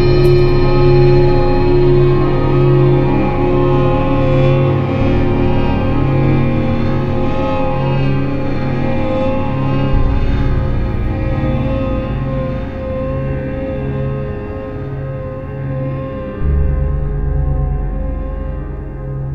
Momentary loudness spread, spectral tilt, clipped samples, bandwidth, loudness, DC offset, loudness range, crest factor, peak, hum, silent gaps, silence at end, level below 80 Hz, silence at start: 12 LU; -9.5 dB/octave; under 0.1%; 5.8 kHz; -16 LUFS; under 0.1%; 9 LU; 14 dB; 0 dBFS; none; none; 0 s; -20 dBFS; 0 s